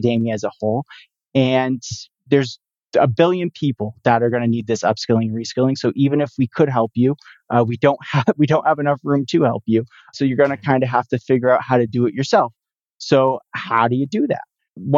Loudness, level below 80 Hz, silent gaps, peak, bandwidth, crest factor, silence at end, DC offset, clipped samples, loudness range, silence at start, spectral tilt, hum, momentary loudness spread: -18 LUFS; -62 dBFS; 2.83-2.87 s, 12.94-12.98 s, 14.69-14.73 s; -2 dBFS; 7.8 kHz; 16 dB; 0 s; under 0.1%; under 0.1%; 2 LU; 0 s; -7 dB/octave; none; 7 LU